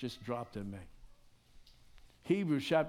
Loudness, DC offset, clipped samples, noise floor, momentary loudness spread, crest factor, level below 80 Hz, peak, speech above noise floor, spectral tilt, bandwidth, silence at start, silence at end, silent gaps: -37 LUFS; under 0.1%; under 0.1%; -61 dBFS; 21 LU; 22 dB; -62 dBFS; -16 dBFS; 26 dB; -6.5 dB/octave; 16.5 kHz; 0 s; 0 s; none